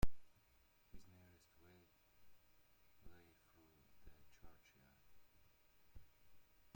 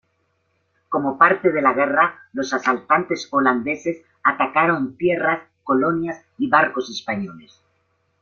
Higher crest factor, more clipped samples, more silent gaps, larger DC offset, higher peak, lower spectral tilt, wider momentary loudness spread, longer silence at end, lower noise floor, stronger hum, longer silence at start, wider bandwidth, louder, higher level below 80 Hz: about the same, 24 dB vs 20 dB; neither; neither; neither; second, -22 dBFS vs -2 dBFS; about the same, -6 dB/octave vs -5.5 dB/octave; second, 3 LU vs 11 LU; second, 0.3 s vs 0.8 s; first, -74 dBFS vs -68 dBFS; neither; second, 0 s vs 0.9 s; first, 16.5 kHz vs 7.2 kHz; second, -63 LUFS vs -20 LUFS; first, -58 dBFS vs -64 dBFS